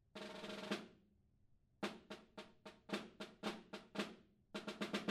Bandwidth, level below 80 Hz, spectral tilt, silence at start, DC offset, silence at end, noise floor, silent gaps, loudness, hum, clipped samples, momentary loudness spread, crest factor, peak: 15.5 kHz; -80 dBFS; -4.5 dB/octave; 0.15 s; under 0.1%; 0 s; -74 dBFS; none; -49 LUFS; none; under 0.1%; 13 LU; 22 dB; -28 dBFS